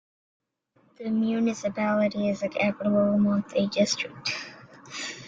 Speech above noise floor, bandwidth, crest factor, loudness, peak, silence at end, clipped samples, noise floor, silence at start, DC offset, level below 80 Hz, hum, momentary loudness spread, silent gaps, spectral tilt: 40 dB; 7.8 kHz; 16 dB; -26 LUFS; -12 dBFS; 0 s; under 0.1%; -66 dBFS; 1 s; under 0.1%; -66 dBFS; none; 12 LU; none; -5 dB/octave